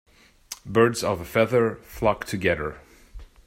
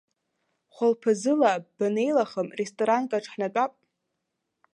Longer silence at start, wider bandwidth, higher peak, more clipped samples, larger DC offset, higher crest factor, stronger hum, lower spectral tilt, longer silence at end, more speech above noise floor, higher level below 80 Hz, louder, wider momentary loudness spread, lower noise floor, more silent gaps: second, 0.5 s vs 0.8 s; first, 16 kHz vs 11 kHz; about the same, -6 dBFS vs -8 dBFS; neither; neither; about the same, 20 dB vs 20 dB; neither; about the same, -5.5 dB/octave vs -5 dB/octave; second, 0.2 s vs 1.05 s; second, 21 dB vs 56 dB; first, -48 dBFS vs -82 dBFS; about the same, -24 LUFS vs -26 LUFS; first, 11 LU vs 8 LU; second, -44 dBFS vs -81 dBFS; neither